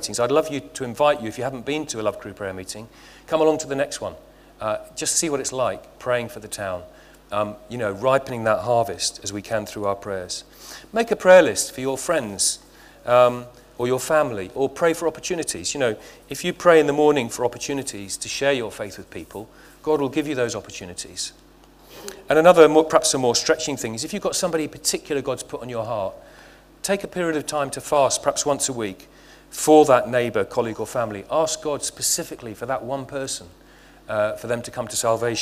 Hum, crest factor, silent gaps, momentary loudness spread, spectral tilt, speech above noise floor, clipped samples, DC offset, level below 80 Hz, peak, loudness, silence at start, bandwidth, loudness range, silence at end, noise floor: none; 22 dB; none; 16 LU; -3.5 dB/octave; 28 dB; under 0.1%; under 0.1%; -54 dBFS; 0 dBFS; -22 LUFS; 0 s; 16 kHz; 7 LU; 0 s; -50 dBFS